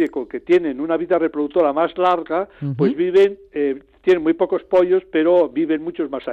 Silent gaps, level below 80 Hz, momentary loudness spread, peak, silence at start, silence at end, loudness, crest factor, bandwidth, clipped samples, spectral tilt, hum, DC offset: none; -56 dBFS; 7 LU; -6 dBFS; 0 s; 0 s; -19 LUFS; 12 dB; 6.6 kHz; under 0.1%; -8 dB/octave; none; under 0.1%